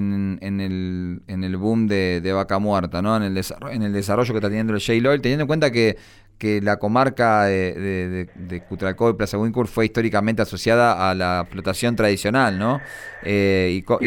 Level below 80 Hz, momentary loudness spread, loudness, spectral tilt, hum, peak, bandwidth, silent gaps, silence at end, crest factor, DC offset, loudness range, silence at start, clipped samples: -46 dBFS; 9 LU; -21 LUFS; -6 dB/octave; none; -6 dBFS; 19 kHz; none; 0 s; 14 dB; under 0.1%; 3 LU; 0 s; under 0.1%